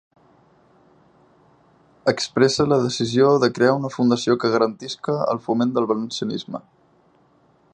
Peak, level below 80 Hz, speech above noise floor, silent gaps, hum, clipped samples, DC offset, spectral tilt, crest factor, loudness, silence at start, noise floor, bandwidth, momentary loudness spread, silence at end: -2 dBFS; -60 dBFS; 38 dB; none; none; under 0.1%; under 0.1%; -5.5 dB/octave; 20 dB; -20 LUFS; 2.05 s; -58 dBFS; 10 kHz; 10 LU; 1.15 s